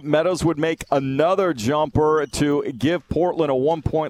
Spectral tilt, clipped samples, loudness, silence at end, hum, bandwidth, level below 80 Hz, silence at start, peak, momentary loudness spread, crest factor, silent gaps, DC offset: -6 dB/octave; under 0.1%; -21 LUFS; 0 s; none; 15 kHz; -42 dBFS; 0 s; -4 dBFS; 3 LU; 18 dB; none; under 0.1%